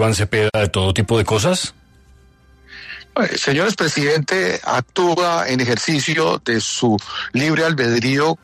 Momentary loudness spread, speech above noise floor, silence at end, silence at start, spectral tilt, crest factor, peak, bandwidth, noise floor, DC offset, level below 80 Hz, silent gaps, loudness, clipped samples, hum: 5 LU; 32 dB; 0.1 s; 0 s; -4.5 dB/octave; 14 dB; -4 dBFS; 13.5 kHz; -50 dBFS; under 0.1%; -46 dBFS; none; -18 LUFS; under 0.1%; none